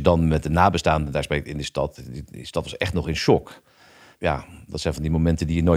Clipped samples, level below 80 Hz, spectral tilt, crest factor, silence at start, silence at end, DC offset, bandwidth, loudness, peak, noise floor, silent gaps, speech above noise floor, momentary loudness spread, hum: under 0.1%; -38 dBFS; -6.5 dB/octave; 20 dB; 0 s; 0 s; under 0.1%; 14 kHz; -23 LUFS; -2 dBFS; -51 dBFS; none; 29 dB; 11 LU; none